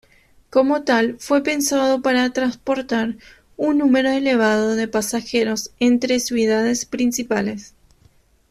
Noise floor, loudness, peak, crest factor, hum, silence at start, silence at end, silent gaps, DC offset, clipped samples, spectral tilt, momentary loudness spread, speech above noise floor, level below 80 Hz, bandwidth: -55 dBFS; -19 LUFS; -4 dBFS; 16 dB; none; 0.5 s; 0.85 s; none; under 0.1%; under 0.1%; -3.5 dB/octave; 6 LU; 37 dB; -56 dBFS; 15 kHz